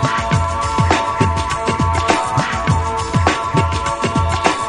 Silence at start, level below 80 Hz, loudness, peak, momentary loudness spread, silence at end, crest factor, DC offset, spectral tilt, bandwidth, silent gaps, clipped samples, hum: 0 s; -30 dBFS; -17 LUFS; 0 dBFS; 3 LU; 0 s; 16 dB; under 0.1%; -5 dB/octave; 11 kHz; none; under 0.1%; none